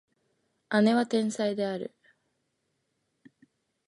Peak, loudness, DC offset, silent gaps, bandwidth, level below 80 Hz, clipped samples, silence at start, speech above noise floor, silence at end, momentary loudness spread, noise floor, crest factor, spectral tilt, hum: -10 dBFS; -27 LUFS; under 0.1%; none; 11.5 kHz; -80 dBFS; under 0.1%; 0.7 s; 52 dB; 2 s; 12 LU; -78 dBFS; 22 dB; -5.5 dB/octave; none